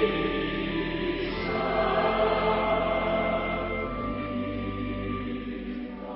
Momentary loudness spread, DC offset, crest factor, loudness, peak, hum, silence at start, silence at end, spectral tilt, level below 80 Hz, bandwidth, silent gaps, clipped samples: 9 LU; under 0.1%; 16 dB; -28 LUFS; -12 dBFS; none; 0 s; 0 s; -10 dB/octave; -42 dBFS; 5.8 kHz; none; under 0.1%